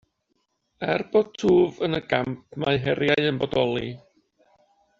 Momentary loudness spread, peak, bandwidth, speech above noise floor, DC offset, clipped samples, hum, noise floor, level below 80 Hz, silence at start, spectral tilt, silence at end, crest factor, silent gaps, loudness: 11 LU; -4 dBFS; 7.4 kHz; 50 dB; under 0.1%; under 0.1%; none; -73 dBFS; -56 dBFS; 0.8 s; -4.5 dB/octave; 1 s; 22 dB; none; -24 LUFS